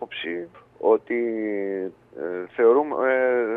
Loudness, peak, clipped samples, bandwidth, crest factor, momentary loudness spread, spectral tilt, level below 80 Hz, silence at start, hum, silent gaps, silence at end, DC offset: -23 LUFS; -6 dBFS; under 0.1%; 3.9 kHz; 16 dB; 15 LU; -7.5 dB/octave; -72 dBFS; 0 s; none; none; 0 s; under 0.1%